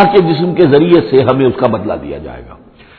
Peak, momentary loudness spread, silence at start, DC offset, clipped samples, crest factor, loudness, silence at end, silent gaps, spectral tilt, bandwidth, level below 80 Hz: 0 dBFS; 16 LU; 0 s; under 0.1%; 0.5%; 10 dB; -11 LUFS; 0.45 s; none; -10 dB/octave; 4.9 kHz; -40 dBFS